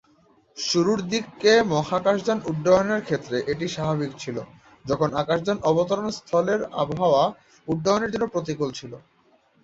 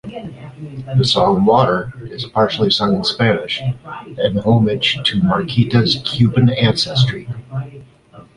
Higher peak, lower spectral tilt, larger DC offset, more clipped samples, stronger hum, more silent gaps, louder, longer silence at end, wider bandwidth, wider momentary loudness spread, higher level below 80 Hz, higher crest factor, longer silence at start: second, -6 dBFS vs -2 dBFS; second, -5 dB/octave vs -6.5 dB/octave; neither; neither; neither; neither; second, -23 LUFS vs -15 LUFS; first, 0.65 s vs 0.15 s; second, 8 kHz vs 11 kHz; second, 11 LU vs 16 LU; second, -56 dBFS vs -44 dBFS; about the same, 18 dB vs 14 dB; first, 0.55 s vs 0.05 s